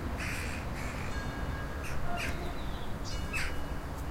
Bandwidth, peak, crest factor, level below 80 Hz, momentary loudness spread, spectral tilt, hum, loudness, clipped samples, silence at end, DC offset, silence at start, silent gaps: 16 kHz; -20 dBFS; 14 dB; -40 dBFS; 5 LU; -5 dB/octave; none; -37 LUFS; under 0.1%; 0 s; under 0.1%; 0 s; none